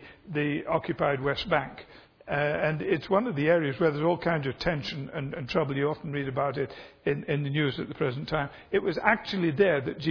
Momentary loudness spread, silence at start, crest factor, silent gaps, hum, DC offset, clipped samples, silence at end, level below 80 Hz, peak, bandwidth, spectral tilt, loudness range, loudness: 9 LU; 0 s; 24 dB; none; none; under 0.1%; under 0.1%; 0 s; -54 dBFS; -4 dBFS; 5.4 kHz; -7.5 dB/octave; 3 LU; -28 LUFS